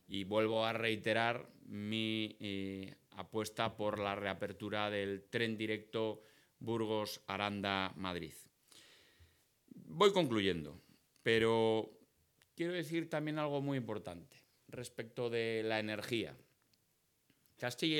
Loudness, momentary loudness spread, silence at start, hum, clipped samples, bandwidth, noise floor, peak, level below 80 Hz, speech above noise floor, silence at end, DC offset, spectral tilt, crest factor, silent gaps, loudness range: -38 LUFS; 16 LU; 0.1 s; none; under 0.1%; 19 kHz; -78 dBFS; -16 dBFS; -78 dBFS; 40 dB; 0 s; under 0.1%; -5 dB/octave; 22 dB; none; 6 LU